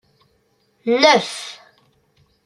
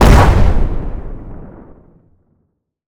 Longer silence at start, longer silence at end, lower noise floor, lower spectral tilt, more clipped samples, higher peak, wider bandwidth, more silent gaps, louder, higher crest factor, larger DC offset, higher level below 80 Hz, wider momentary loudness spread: first, 0.85 s vs 0 s; second, 0.9 s vs 1.4 s; about the same, -63 dBFS vs -65 dBFS; second, -2.5 dB/octave vs -6.5 dB/octave; neither; about the same, -2 dBFS vs 0 dBFS; second, 12.5 kHz vs 16.5 kHz; neither; about the same, -16 LUFS vs -14 LUFS; first, 20 dB vs 12 dB; neither; second, -68 dBFS vs -16 dBFS; second, 18 LU vs 26 LU